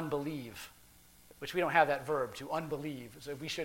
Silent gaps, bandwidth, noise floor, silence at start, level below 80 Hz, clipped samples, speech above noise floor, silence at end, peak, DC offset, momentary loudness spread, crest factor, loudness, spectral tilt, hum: none; 16.5 kHz; -60 dBFS; 0 s; -66 dBFS; under 0.1%; 25 dB; 0 s; -12 dBFS; under 0.1%; 17 LU; 24 dB; -35 LUFS; -5 dB/octave; none